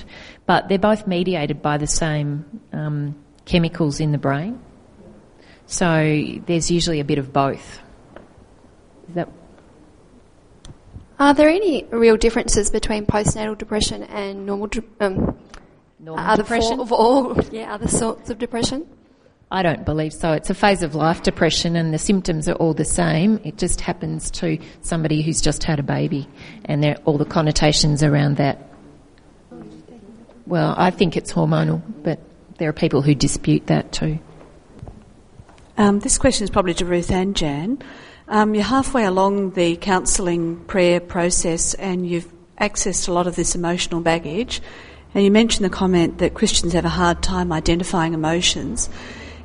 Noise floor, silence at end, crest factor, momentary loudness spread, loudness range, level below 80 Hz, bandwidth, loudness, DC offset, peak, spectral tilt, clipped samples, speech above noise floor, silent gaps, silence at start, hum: -53 dBFS; 0 s; 18 dB; 11 LU; 5 LU; -34 dBFS; 11 kHz; -19 LUFS; under 0.1%; -2 dBFS; -4.5 dB/octave; under 0.1%; 34 dB; none; 0 s; none